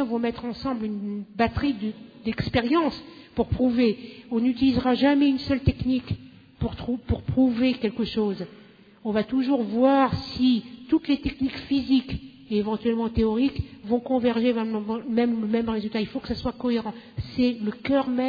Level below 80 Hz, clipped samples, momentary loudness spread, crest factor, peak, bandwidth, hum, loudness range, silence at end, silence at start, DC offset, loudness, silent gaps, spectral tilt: -44 dBFS; under 0.1%; 11 LU; 16 dB; -8 dBFS; 5 kHz; none; 3 LU; 0 s; 0 s; under 0.1%; -25 LUFS; none; -8.5 dB/octave